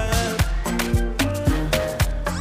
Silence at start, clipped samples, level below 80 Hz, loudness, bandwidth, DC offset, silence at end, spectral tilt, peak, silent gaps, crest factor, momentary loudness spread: 0 s; under 0.1%; -26 dBFS; -23 LUFS; 16.5 kHz; under 0.1%; 0 s; -5 dB/octave; -8 dBFS; none; 14 dB; 2 LU